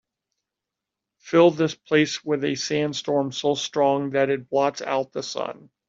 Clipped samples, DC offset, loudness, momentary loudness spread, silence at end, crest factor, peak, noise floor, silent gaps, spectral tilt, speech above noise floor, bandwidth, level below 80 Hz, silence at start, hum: under 0.1%; under 0.1%; -23 LUFS; 10 LU; 0.35 s; 20 dB; -4 dBFS; -86 dBFS; none; -4.5 dB/octave; 63 dB; 7.8 kHz; -68 dBFS; 1.25 s; none